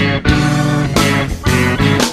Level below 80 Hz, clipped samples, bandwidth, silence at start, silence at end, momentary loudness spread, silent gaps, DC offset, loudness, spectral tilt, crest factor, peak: -26 dBFS; under 0.1%; 15.5 kHz; 0 s; 0 s; 2 LU; none; under 0.1%; -13 LUFS; -5 dB/octave; 14 dB; 0 dBFS